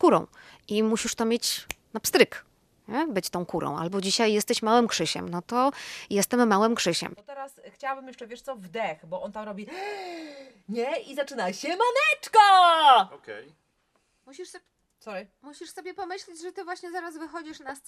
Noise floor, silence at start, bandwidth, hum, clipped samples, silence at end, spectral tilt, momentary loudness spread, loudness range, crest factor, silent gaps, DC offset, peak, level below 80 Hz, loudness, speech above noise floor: -71 dBFS; 0 s; 14.5 kHz; none; under 0.1%; 0.1 s; -3 dB/octave; 21 LU; 17 LU; 24 dB; none; under 0.1%; -2 dBFS; -66 dBFS; -24 LUFS; 45 dB